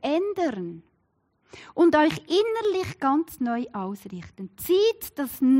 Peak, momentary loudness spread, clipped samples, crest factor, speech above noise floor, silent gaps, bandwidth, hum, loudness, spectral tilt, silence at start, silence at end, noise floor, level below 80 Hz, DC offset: -10 dBFS; 17 LU; under 0.1%; 14 dB; 46 dB; none; 16 kHz; none; -25 LUFS; -5 dB/octave; 0.05 s; 0 s; -70 dBFS; -62 dBFS; under 0.1%